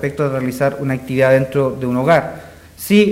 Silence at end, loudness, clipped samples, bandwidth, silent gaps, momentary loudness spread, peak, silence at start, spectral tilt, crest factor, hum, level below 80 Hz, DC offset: 0 s; -16 LUFS; under 0.1%; 16.5 kHz; none; 12 LU; -2 dBFS; 0 s; -6.5 dB/octave; 14 dB; none; -48 dBFS; under 0.1%